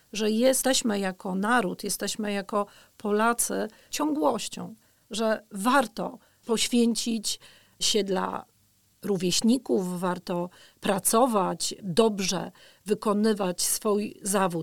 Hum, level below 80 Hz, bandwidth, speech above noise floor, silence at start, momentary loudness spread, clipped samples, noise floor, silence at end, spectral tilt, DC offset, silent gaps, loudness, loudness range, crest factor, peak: none; -60 dBFS; 19 kHz; 38 dB; 0.15 s; 12 LU; under 0.1%; -65 dBFS; 0 s; -3.5 dB/octave; 0.3%; none; -26 LUFS; 3 LU; 20 dB; -8 dBFS